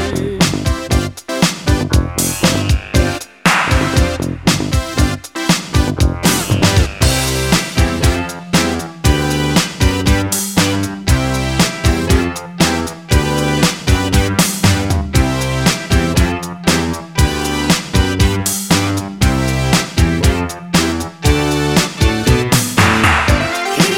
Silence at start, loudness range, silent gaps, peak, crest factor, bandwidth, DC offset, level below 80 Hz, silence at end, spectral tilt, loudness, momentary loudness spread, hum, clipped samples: 0 s; 1 LU; none; 0 dBFS; 14 dB; 17 kHz; 0.1%; -22 dBFS; 0 s; -4.5 dB/octave; -15 LUFS; 4 LU; none; under 0.1%